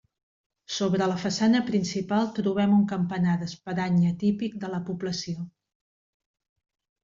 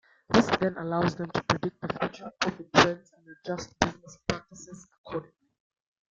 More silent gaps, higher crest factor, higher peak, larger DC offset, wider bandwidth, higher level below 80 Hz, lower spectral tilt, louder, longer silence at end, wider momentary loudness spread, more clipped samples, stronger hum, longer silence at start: second, none vs 4.98-5.04 s; second, 14 dB vs 28 dB; second, -12 dBFS vs -2 dBFS; neither; about the same, 7.6 kHz vs 7.8 kHz; second, -64 dBFS vs -56 dBFS; first, -6 dB/octave vs -4.5 dB/octave; about the same, -26 LUFS vs -28 LUFS; first, 1.55 s vs 0.9 s; second, 10 LU vs 18 LU; neither; neither; first, 0.7 s vs 0.3 s